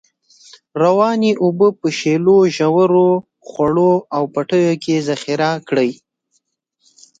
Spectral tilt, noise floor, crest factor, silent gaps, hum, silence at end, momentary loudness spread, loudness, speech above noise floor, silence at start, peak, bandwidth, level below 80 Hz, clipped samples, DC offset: -6.5 dB/octave; -66 dBFS; 14 dB; none; none; 1.25 s; 8 LU; -15 LUFS; 52 dB; 0.75 s; -2 dBFS; 8.6 kHz; -58 dBFS; under 0.1%; under 0.1%